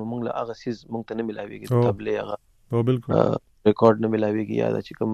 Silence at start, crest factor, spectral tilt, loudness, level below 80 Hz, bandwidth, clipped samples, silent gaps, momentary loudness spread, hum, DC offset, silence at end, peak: 0 s; 20 dB; -8.5 dB/octave; -24 LUFS; -58 dBFS; 12.5 kHz; under 0.1%; none; 13 LU; none; under 0.1%; 0 s; -4 dBFS